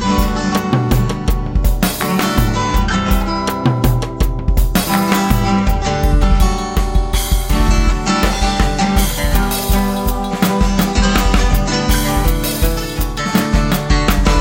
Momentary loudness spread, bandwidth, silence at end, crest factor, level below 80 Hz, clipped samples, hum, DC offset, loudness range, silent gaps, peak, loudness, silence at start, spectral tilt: 4 LU; 17 kHz; 0 s; 14 dB; -16 dBFS; under 0.1%; none; under 0.1%; 1 LU; none; 0 dBFS; -16 LUFS; 0 s; -5 dB/octave